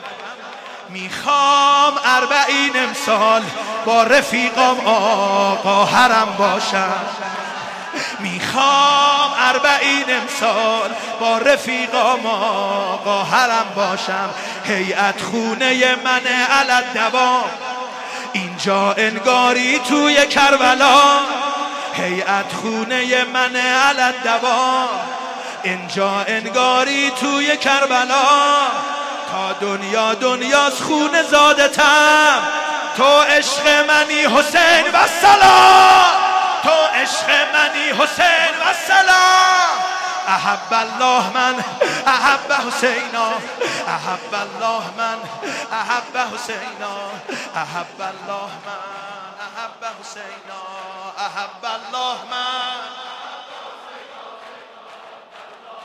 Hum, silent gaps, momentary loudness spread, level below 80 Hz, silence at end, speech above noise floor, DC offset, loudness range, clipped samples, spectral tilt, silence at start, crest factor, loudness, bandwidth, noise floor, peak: none; none; 16 LU; -58 dBFS; 0 s; 24 dB; under 0.1%; 15 LU; under 0.1%; -2 dB/octave; 0 s; 16 dB; -15 LUFS; 15.5 kHz; -40 dBFS; 0 dBFS